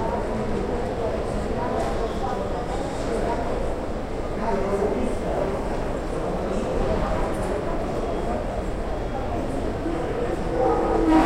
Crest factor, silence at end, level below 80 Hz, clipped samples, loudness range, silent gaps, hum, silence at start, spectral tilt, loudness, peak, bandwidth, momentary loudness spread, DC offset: 18 dB; 0 s; -32 dBFS; under 0.1%; 1 LU; none; none; 0 s; -7 dB/octave; -26 LUFS; -6 dBFS; 13 kHz; 5 LU; under 0.1%